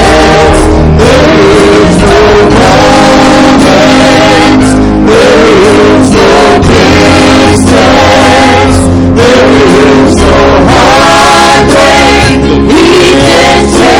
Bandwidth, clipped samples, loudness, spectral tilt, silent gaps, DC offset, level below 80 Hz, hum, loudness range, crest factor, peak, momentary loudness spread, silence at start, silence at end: 17.5 kHz; 10%; -3 LUFS; -5 dB/octave; none; under 0.1%; -16 dBFS; none; 0 LU; 2 dB; 0 dBFS; 2 LU; 0 s; 0 s